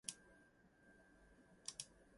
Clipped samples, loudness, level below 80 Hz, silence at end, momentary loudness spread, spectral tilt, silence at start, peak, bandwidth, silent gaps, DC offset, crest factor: under 0.1%; -53 LUFS; -78 dBFS; 0 s; 18 LU; -0.5 dB/octave; 0.05 s; -28 dBFS; 11.5 kHz; none; under 0.1%; 32 dB